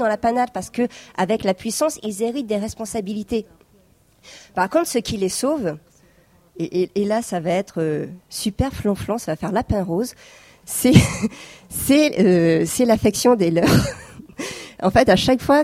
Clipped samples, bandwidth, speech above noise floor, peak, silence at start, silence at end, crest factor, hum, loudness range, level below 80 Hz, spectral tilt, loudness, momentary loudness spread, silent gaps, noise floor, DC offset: under 0.1%; 16 kHz; 36 dB; 0 dBFS; 0 s; 0 s; 20 dB; none; 7 LU; -42 dBFS; -5.5 dB/octave; -20 LUFS; 13 LU; none; -56 dBFS; under 0.1%